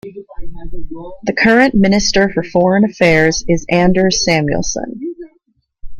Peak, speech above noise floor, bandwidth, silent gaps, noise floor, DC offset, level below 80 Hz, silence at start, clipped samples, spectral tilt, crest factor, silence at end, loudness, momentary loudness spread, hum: 0 dBFS; 47 dB; 10.5 kHz; none; -60 dBFS; under 0.1%; -32 dBFS; 0.05 s; under 0.1%; -4.5 dB/octave; 14 dB; 0 s; -13 LUFS; 21 LU; none